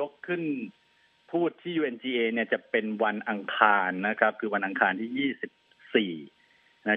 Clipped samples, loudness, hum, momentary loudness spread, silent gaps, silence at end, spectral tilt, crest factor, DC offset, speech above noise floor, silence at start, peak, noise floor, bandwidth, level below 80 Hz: under 0.1%; -28 LUFS; none; 11 LU; none; 0 s; -8 dB/octave; 26 dB; under 0.1%; 21 dB; 0 s; -2 dBFS; -49 dBFS; 4.6 kHz; -84 dBFS